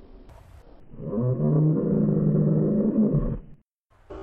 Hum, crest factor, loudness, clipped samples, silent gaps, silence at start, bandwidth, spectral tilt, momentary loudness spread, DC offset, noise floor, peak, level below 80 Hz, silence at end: none; 12 dB; -23 LUFS; under 0.1%; 3.74-3.84 s; 0 s; 2 kHz; -13.5 dB/octave; 12 LU; under 0.1%; -60 dBFS; -12 dBFS; -42 dBFS; 0 s